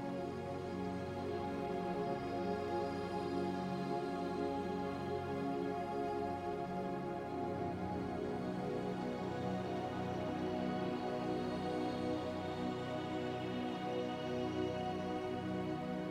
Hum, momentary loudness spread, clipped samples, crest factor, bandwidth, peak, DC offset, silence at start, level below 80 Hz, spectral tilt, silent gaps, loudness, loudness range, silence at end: none; 2 LU; under 0.1%; 14 dB; 14 kHz; -26 dBFS; under 0.1%; 0 s; -66 dBFS; -7 dB/octave; none; -40 LUFS; 1 LU; 0 s